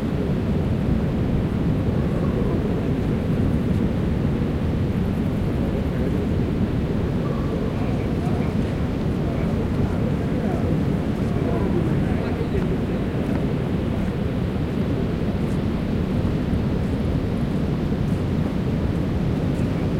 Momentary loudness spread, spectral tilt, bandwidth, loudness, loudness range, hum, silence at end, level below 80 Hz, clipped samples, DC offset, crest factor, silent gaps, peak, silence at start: 2 LU; -8.5 dB/octave; 15.5 kHz; -23 LUFS; 1 LU; none; 0 s; -32 dBFS; under 0.1%; under 0.1%; 12 dB; none; -8 dBFS; 0 s